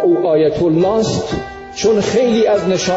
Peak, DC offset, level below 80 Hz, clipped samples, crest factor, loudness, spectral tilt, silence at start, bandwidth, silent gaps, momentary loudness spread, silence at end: -4 dBFS; under 0.1%; -42 dBFS; under 0.1%; 10 dB; -15 LUFS; -5.5 dB/octave; 0 s; 8 kHz; none; 9 LU; 0 s